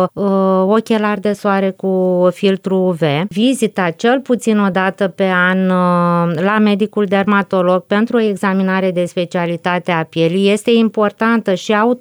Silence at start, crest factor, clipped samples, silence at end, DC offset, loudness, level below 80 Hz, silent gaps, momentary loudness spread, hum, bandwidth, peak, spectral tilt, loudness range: 0 s; 12 dB; under 0.1%; 0 s; under 0.1%; -14 LUFS; -62 dBFS; none; 4 LU; none; over 20 kHz; -2 dBFS; -6.5 dB/octave; 1 LU